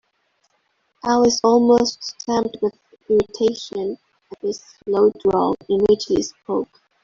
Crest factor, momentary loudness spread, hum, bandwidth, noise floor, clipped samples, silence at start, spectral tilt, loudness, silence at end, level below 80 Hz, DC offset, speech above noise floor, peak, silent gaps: 16 dB; 13 LU; none; 7.6 kHz; -67 dBFS; under 0.1%; 1.05 s; -4.5 dB/octave; -20 LUFS; 0.4 s; -52 dBFS; under 0.1%; 49 dB; -4 dBFS; none